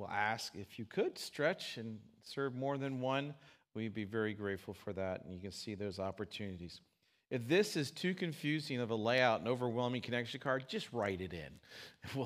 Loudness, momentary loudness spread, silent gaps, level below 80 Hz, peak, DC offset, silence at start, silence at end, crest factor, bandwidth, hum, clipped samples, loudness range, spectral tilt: -39 LUFS; 16 LU; none; -76 dBFS; -16 dBFS; under 0.1%; 0 s; 0 s; 22 dB; 15.5 kHz; none; under 0.1%; 7 LU; -5 dB/octave